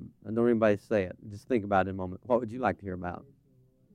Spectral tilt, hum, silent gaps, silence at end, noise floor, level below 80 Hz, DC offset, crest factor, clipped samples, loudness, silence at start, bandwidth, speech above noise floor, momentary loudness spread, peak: -8 dB/octave; none; none; 0.7 s; -64 dBFS; -66 dBFS; under 0.1%; 18 dB; under 0.1%; -30 LUFS; 0 s; 10.5 kHz; 35 dB; 12 LU; -12 dBFS